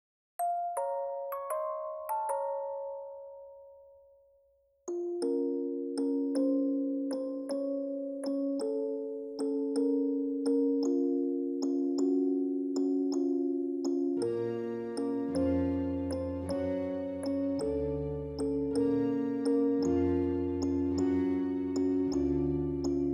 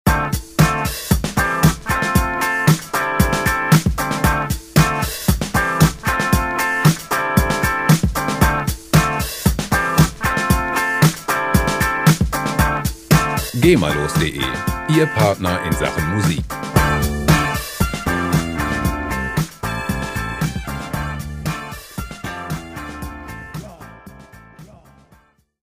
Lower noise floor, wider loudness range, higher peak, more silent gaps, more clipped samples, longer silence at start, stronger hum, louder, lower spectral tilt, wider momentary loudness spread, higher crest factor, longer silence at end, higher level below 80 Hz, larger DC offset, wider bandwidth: first, -69 dBFS vs -53 dBFS; second, 7 LU vs 10 LU; second, -20 dBFS vs 0 dBFS; neither; neither; first, 0.4 s vs 0.05 s; neither; second, -32 LUFS vs -18 LUFS; first, -7.5 dB/octave vs -5 dB/octave; second, 7 LU vs 11 LU; second, 12 dB vs 18 dB; second, 0 s vs 1 s; second, -54 dBFS vs -28 dBFS; neither; second, 14 kHz vs 16 kHz